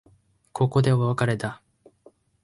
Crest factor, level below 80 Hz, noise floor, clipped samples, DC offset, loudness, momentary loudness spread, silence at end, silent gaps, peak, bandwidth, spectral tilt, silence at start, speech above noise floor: 16 dB; -58 dBFS; -60 dBFS; under 0.1%; under 0.1%; -24 LUFS; 17 LU; 0.9 s; none; -10 dBFS; 11.5 kHz; -7.5 dB/octave; 0.55 s; 38 dB